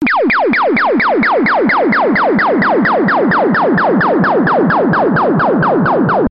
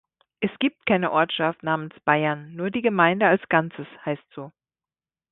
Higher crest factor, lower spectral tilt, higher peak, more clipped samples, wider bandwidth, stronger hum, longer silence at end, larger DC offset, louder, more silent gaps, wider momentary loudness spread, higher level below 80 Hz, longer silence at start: second, 10 dB vs 20 dB; second, -5 dB/octave vs -10.5 dB/octave; about the same, -2 dBFS vs -4 dBFS; neither; first, 5.6 kHz vs 4.1 kHz; neither; second, 0 s vs 0.85 s; neither; first, -11 LUFS vs -23 LUFS; neither; second, 1 LU vs 14 LU; first, -46 dBFS vs -64 dBFS; second, 0 s vs 0.4 s